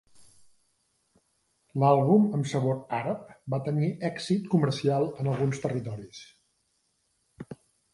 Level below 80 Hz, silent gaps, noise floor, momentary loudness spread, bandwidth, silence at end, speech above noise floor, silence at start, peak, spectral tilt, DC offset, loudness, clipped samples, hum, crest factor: -66 dBFS; none; -74 dBFS; 23 LU; 11.5 kHz; 0.4 s; 47 dB; 0.2 s; -10 dBFS; -7.5 dB/octave; under 0.1%; -27 LUFS; under 0.1%; none; 20 dB